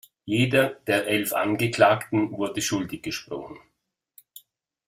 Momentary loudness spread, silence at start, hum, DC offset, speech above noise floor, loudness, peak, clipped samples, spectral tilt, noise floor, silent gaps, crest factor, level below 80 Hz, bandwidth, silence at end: 13 LU; 0.25 s; none; under 0.1%; 52 dB; -24 LUFS; -4 dBFS; under 0.1%; -4.5 dB/octave; -76 dBFS; none; 22 dB; -60 dBFS; 16 kHz; 1.3 s